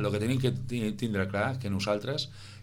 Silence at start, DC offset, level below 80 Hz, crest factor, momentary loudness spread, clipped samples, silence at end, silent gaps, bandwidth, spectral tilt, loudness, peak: 0 s; under 0.1%; -54 dBFS; 16 dB; 5 LU; under 0.1%; 0 s; none; 16.5 kHz; -6 dB/octave; -31 LUFS; -14 dBFS